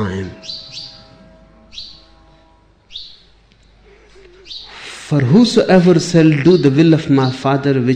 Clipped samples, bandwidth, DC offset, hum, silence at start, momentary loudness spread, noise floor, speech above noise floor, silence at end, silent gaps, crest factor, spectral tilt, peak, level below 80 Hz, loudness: under 0.1%; 9.8 kHz; under 0.1%; none; 0 s; 21 LU; -50 dBFS; 38 dB; 0 s; none; 14 dB; -6.5 dB/octave; -2 dBFS; -48 dBFS; -12 LUFS